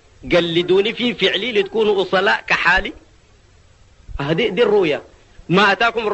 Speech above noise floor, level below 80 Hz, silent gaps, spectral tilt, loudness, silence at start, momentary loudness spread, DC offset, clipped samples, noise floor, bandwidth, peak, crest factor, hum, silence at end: 33 dB; -42 dBFS; none; -5 dB/octave; -17 LUFS; 0.2 s; 7 LU; under 0.1%; under 0.1%; -50 dBFS; 8.4 kHz; -2 dBFS; 16 dB; none; 0 s